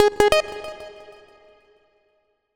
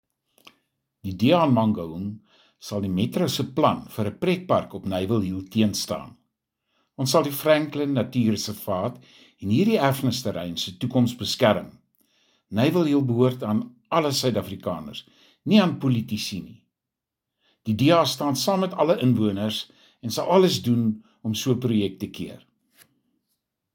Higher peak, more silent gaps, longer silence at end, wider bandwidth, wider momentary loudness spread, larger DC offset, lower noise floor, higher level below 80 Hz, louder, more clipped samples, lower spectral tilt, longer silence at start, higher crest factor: about the same, -2 dBFS vs -4 dBFS; neither; first, 1.65 s vs 1.4 s; first, 20 kHz vs 17 kHz; first, 24 LU vs 14 LU; neither; second, -68 dBFS vs -86 dBFS; first, -48 dBFS vs -62 dBFS; first, -20 LUFS vs -23 LUFS; neither; second, -3 dB/octave vs -5.5 dB/octave; second, 0 s vs 1.05 s; about the same, 22 dB vs 20 dB